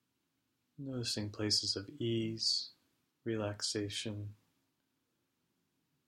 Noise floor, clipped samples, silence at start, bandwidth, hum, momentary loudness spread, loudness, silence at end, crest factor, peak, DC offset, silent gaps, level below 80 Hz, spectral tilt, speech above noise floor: -82 dBFS; under 0.1%; 0.8 s; 16 kHz; none; 15 LU; -36 LUFS; 1.75 s; 22 dB; -18 dBFS; under 0.1%; none; -72 dBFS; -3.5 dB/octave; 45 dB